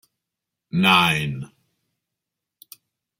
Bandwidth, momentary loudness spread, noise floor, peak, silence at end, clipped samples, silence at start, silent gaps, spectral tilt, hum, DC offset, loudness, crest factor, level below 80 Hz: 16.5 kHz; 19 LU; -84 dBFS; -2 dBFS; 1.75 s; under 0.1%; 0.75 s; none; -4.5 dB/octave; none; under 0.1%; -18 LUFS; 22 dB; -58 dBFS